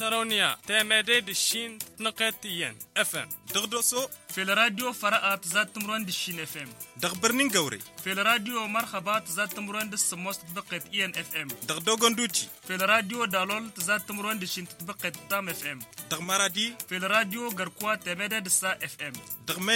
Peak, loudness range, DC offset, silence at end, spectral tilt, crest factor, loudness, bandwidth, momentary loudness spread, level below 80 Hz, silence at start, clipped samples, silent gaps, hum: -6 dBFS; 3 LU; under 0.1%; 0 s; -1.5 dB/octave; 22 dB; -27 LUFS; 17 kHz; 11 LU; -72 dBFS; 0 s; under 0.1%; none; none